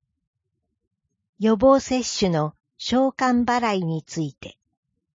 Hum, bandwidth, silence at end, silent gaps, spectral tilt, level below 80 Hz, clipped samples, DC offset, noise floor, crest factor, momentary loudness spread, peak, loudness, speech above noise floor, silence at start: none; 7.8 kHz; 0.7 s; none; -5 dB/octave; -52 dBFS; under 0.1%; under 0.1%; -78 dBFS; 18 dB; 13 LU; -6 dBFS; -22 LUFS; 57 dB; 1.4 s